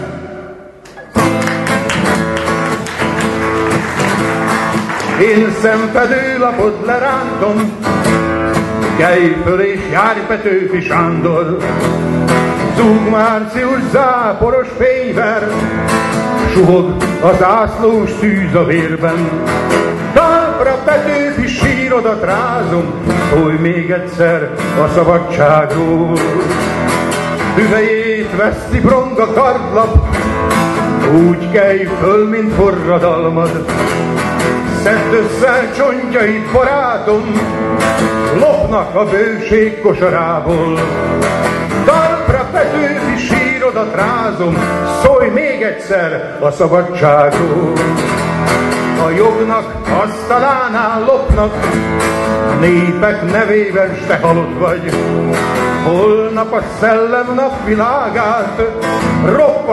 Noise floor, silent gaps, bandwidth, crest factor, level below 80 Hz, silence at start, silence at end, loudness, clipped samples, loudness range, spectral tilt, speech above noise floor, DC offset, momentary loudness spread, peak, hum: -33 dBFS; none; 12.5 kHz; 12 dB; -30 dBFS; 0 s; 0 s; -12 LUFS; under 0.1%; 2 LU; -6 dB/octave; 22 dB; under 0.1%; 5 LU; 0 dBFS; none